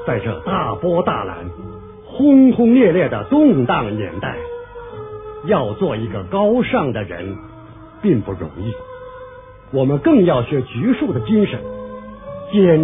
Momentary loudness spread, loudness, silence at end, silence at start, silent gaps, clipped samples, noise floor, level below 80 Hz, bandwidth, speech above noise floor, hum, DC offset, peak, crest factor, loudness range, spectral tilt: 20 LU; -17 LUFS; 0 s; 0 s; none; under 0.1%; -38 dBFS; -44 dBFS; 3.8 kHz; 23 dB; none; under 0.1%; -2 dBFS; 16 dB; 6 LU; -12 dB/octave